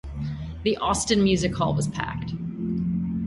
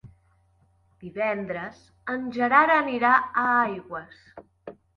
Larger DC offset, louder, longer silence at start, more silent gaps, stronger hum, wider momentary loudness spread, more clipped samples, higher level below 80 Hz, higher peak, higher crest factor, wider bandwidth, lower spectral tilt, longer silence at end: neither; about the same, -25 LUFS vs -23 LUFS; about the same, 0.05 s vs 0.05 s; neither; neither; second, 11 LU vs 20 LU; neither; first, -42 dBFS vs -64 dBFS; second, -8 dBFS vs -4 dBFS; about the same, 18 dB vs 22 dB; first, 11.5 kHz vs 7 kHz; second, -5 dB/octave vs -6.5 dB/octave; second, 0 s vs 0.25 s